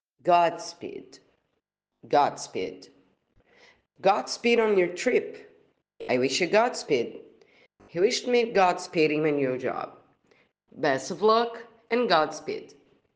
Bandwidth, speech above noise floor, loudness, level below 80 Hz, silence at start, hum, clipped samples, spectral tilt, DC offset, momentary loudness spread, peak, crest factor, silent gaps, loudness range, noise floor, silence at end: 9.8 kHz; 55 dB; -25 LUFS; -74 dBFS; 0.25 s; none; under 0.1%; -4 dB/octave; under 0.1%; 15 LU; -6 dBFS; 22 dB; none; 4 LU; -80 dBFS; 0.5 s